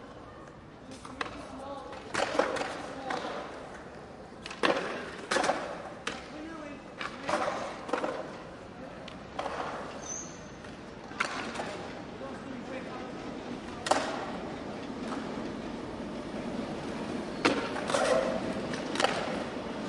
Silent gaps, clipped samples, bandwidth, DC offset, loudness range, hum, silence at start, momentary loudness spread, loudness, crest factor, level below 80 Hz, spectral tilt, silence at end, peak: none; under 0.1%; 11.5 kHz; under 0.1%; 6 LU; none; 0 s; 15 LU; -35 LUFS; 28 dB; -58 dBFS; -3.5 dB/octave; 0 s; -8 dBFS